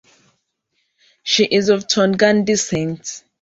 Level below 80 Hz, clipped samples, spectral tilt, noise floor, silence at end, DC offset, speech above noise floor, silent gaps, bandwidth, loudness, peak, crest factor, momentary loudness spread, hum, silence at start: -56 dBFS; under 0.1%; -3.5 dB/octave; -70 dBFS; 0.25 s; under 0.1%; 53 dB; none; 8 kHz; -16 LUFS; -2 dBFS; 18 dB; 14 LU; none; 1.25 s